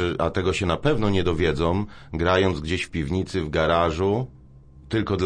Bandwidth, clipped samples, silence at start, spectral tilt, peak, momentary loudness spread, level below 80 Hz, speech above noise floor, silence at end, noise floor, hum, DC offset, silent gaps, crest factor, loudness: 10 kHz; under 0.1%; 0 s; -6.5 dB/octave; -6 dBFS; 7 LU; -38 dBFS; 25 dB; 0 s; -47 dBFS; none; under 0.1%; none; 16 dB; -23 LUFS